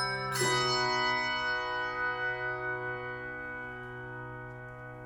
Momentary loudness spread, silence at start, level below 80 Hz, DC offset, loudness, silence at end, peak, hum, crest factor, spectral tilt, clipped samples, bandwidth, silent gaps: 15 LU; 0 s; -60 dBFS; under 0.1%; -32 LUFS; 0 s; -16 dBFS; none; 18 dB; -3 dB/octave; under 0.1%; 16.5 kHz; none